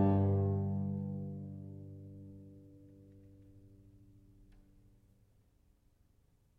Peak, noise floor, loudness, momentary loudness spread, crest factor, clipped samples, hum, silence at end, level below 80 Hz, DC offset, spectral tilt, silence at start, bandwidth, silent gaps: -18 dBFS; -70 dBFS; -36 LUFS; 28 LU; 22 dB; under 0.1%; none; 2.9 s; -68 dBFS; under 0.1%; -12 dB/octave; 0 s; 2.9 kHz; none